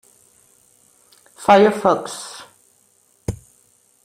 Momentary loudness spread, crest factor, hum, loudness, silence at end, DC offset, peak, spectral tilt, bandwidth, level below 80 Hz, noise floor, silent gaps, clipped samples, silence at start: 23 LU; 20 dB; none; -17 LUFS; 0.7 s; under 0.1%; -2 dBFS; -5 dB/octave; 15 kHz; -50 dBFS; -59 dBFS; none; under 0.1%; 1.4 s